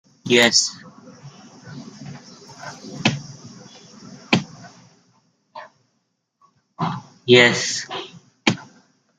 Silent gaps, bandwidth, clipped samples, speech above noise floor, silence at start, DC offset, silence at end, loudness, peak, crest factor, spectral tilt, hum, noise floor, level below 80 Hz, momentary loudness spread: none; 15.5 kHz; under 0.1%; 56 dB; 0.25 s; under 0.1%; 0.55 s; -18 LUFS; 0 dBFS; 24 dB; -3 dB/octave; none; -72 dBFS; -66 dBFS; 28 LU